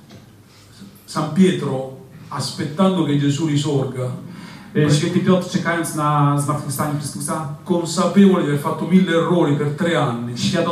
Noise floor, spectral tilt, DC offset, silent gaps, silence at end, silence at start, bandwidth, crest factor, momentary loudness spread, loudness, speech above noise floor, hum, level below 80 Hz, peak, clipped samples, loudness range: -46 dBFS; -6 dB/octave; under 0.1%; none; 0 s; 0.1 s; 14.5 kHz; 16 dB; 11 LU; -19 LUFS; 28 dB; none; -58 dBFS; -2 dBFS; under 0.1%; 3 LU